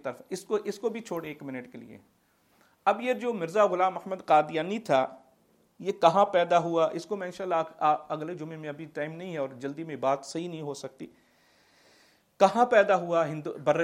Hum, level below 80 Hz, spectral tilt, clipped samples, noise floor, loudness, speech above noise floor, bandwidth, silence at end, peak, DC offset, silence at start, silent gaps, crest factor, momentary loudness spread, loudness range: none; -78 dBFS; -5.5 dB/octave; under 0.1%; -66 dBFS; -28 LUFS; 38 dB; 14.5 kHz; 0 s; -6 dBFS; under 0.1%; 0.05 s; none; 22 dB; 15 LU; 9 LU